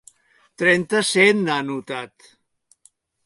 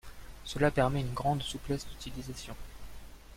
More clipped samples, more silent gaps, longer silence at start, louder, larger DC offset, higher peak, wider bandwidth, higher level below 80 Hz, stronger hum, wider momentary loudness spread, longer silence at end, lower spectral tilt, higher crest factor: neither; neither; first, 0.6 s vs 0.05 s; first, -19 LUFS vs -33 LUFS; neither; first, -4 dBFS vs -14 dBFS; second, 11.5 kHz vs 16.5 kHz; second, -68 dBFS vs -46 dBFS; neither; second, 16 LU vs 23 LU; first, 1.2 s vs 0 s; second, -4 dB/octave vs -5.5 dB/octave; about the same, 20 dB vs 20 dB